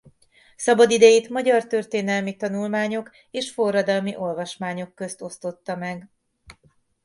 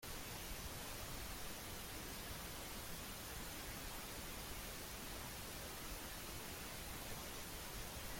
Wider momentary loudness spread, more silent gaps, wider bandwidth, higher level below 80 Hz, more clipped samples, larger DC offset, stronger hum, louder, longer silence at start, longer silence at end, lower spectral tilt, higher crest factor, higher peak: first, 18 LU vs 0 LU; neither; second, 11.5 kHz vs 16.5 kHz; second, -66 dBFS vs -56 dBFS; neither; neither; neither; first, -22 LUFS vs -48 LUFS; first, 0.6 s vs 0 s; first, 0.5 s vs 0 s; first, -4 dB/octave vs -2.5 dB/octave; first, 20 dB vs 14 dB; first, -2 dBFS vs -36 dBFS